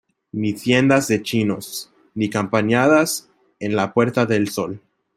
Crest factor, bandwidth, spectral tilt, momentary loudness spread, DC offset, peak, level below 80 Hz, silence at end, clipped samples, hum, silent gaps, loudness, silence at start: 18 dB; 16 kHz; -5 dB/octave; 15 LU; under 0.1%; -2 dBFS; -60 dBFS; 0.4 s; under 0.1%; none; none; -19 LUFS; 0.35 s